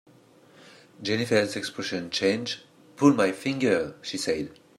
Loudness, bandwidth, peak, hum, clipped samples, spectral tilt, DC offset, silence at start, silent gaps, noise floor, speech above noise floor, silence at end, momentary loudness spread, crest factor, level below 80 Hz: -26 LUFS; 13.5 kHz; -6 dBFS; none; under 0.1%; -4.5 dB/octave; under 0.1%; 1 s; none; -56 dBFS; 30 dB; 0.25 s; 10 LU; 22 dB; -66 dBFS